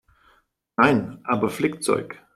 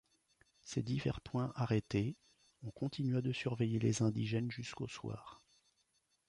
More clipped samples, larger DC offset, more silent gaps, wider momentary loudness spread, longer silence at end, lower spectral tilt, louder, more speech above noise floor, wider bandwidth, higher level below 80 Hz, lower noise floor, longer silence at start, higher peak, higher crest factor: neither; neither; neither; second, 7 LU vs 16 LU; second, 0.2 s vs 0.9 s; about the same, -5.5 dB/octave vs -6.5 dB/octave; first, -23 LUFS vs -38 LUFS; about the same, 40 dB vs 42 dB; first, 15.5 kHz vs 11 kHz; about the same, -60 dBFS vs -64 dBFS; second, -63 dBFS vs -79 dBFS; first, 0.8 s vs 0.65 s; first, -2 dBFS vs -22 dBFS; about the same, 22 dB vs 18 dB